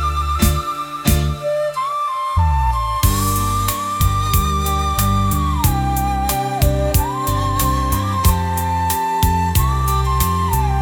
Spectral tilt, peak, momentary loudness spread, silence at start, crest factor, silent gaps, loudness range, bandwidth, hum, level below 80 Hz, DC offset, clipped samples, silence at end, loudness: -5 dB/octave; -2 dBFS; 3 LU; 0 s; 16 dB; none; 1 LU; 19 kHz; none; -22 dBFS; under 0.1%; under 0.1%; 0 s; -18 LUFS